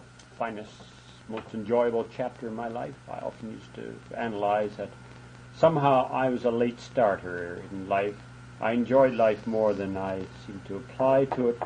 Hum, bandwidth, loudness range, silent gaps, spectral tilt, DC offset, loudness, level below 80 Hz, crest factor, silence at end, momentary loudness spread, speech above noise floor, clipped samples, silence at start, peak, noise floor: none; 10 kHz; 6 LU; none; -7 dB/octave; under 0.1%; -27 LUFS; -60 dBFS; 20 dB; 0 s; 18 LU; 20 dB; under 0.1%; 0 s; -8 dBFS; -47 dBFS